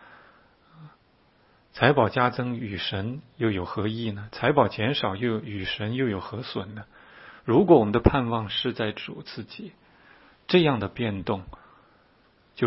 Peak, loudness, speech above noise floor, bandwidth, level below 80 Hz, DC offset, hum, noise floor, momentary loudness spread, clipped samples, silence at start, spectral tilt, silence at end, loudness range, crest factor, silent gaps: -2 dBFS; -25 LUFS; 37 dB; 5.8 kHz; -46 dBFS; under 0.1%; none; -62 dBFS; 18 LU; under 0.1%; 0.8 s; -10.5 dB/octave; 0 s; 4 LU; 24 dB; none